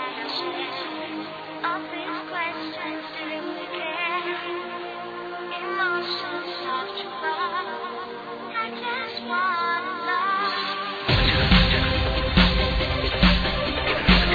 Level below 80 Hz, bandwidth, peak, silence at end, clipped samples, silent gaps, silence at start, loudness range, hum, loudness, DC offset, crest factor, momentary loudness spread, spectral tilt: -32 dBFS; 5 kHz; -4 dBFS; 0 s; under 0.1%; none; 0 s; 9 LU; none; -25 LUFS; under 0.1%; 22 dB; 13 LU; -6.5 dB/octave